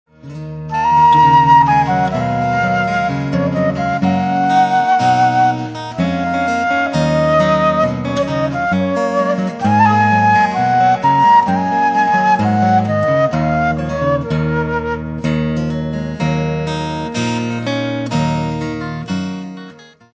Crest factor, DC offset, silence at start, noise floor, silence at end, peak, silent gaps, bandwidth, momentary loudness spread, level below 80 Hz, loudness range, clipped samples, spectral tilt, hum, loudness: 14 dB; under 0.1%; 0.25 s; -38 dBFS; 0.35 s; 0 dBFS; none; 8 kHz; 11 LU; -38 dBFS; 7 LU; under 0.1%; -6.5 dB/octave; none; -15 LUFS